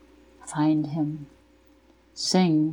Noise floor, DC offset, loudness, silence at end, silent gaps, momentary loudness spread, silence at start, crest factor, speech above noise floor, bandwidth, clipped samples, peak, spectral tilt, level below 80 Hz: -58 dBFS; under 0.1%; -25 LUFS; 0 s; none; 21 LU; 0.45 s; 18 dB; 34 dB; 11 kHz; under 0.1%; -8 dBFS; -5.5 dB/octave; -62 dBFS